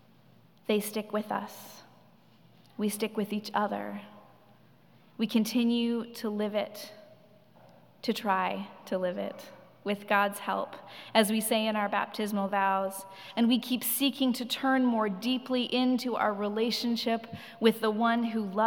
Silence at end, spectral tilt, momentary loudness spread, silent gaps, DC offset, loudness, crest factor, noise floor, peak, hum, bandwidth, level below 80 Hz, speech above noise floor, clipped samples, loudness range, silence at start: 0 s; -4 dB/octave; 13 LU; none; under 0.1%; -30 LUFS; 24 dB; -60 dBFS; -8 dBFS; none; 18 kHz; -88 dBFS; 31 dB; under 0.1%; 7 LU; 0.7 s